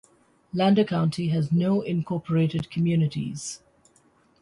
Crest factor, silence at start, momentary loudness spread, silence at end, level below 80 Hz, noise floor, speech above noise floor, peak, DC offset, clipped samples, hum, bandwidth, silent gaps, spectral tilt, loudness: 14 dB; 0.55 s; 12 LU; 0.85 s; -60 dBFS; -61 dBFS; 38 dB; -10 dBFS; under 0.1%; under 0.1%; none; 11.5 kHz; none; -7 dB/octave; -25 LUFS